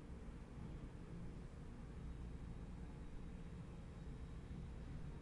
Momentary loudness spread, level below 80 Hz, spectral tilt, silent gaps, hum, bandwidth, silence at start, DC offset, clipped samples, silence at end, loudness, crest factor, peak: 2 LU; -54 dBFS; -7.5 dB/octave; none; none; 11 kHz; 0 s; under 0.1%; under 0.1%; 0 s; -54 LUFS; 12 dB; -40 dBFS